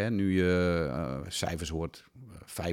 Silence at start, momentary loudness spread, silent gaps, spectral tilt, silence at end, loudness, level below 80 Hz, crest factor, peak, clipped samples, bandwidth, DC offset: 0 s; 21 LU; none; -5.5 dB/octave; 0 s; -31 LUFS; -48 dBFS; 16 dB; -14 dBFS; under 0.1%; 16.5 kHz; under 0.1%